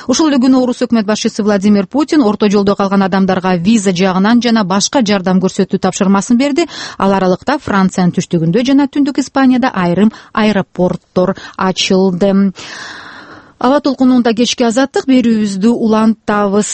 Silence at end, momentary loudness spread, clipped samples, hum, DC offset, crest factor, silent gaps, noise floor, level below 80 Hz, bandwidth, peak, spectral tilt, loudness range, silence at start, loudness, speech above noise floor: 0 s; 5 LU; under 0.1%; none; under 0.1%; 12 dB; none; -35 dBFS; -46 dBFS; 8.8 kHz; 0 dBFS; -5.5 dB/octave; 2 LU; 0 s; -12 LUFS; 24 dB